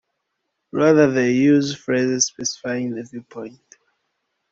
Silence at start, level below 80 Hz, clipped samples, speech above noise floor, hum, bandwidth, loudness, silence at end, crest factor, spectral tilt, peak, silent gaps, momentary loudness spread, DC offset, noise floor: 0.75 s; -62 dBFS; under 0.1%; 57 dB; none; 7.8 kHz; -19 LUFS; 1 s; 18 dB; -4.5 dB/octave; -2 dBFS; none; 20 LU; under 0.1%; -76 dBFS